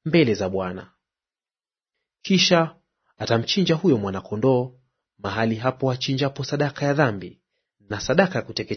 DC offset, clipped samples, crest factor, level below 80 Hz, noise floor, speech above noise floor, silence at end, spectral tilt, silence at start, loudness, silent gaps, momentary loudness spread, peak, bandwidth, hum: under 0.1%; under 0.1%; 22 dB; -58 dBFS; under -90 dBFS; over 68 dB; 0 s; -5.5 dB/octave; 0.05 s; -22 LUFS; none; 14 LU; -2 dBFS; 6.6 kHz; none